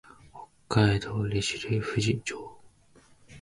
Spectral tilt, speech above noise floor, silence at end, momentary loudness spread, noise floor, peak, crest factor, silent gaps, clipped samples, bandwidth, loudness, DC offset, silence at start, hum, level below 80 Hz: -5.5 dB/octave; 32 dB; 0 s; 24 LU; -59 dBFS; -10 dBFS; 20 dB; none; under 0.1%; 11.5 kHz; -28 LUFS; under 0.1%; 0.25 s; none; -50 dBFS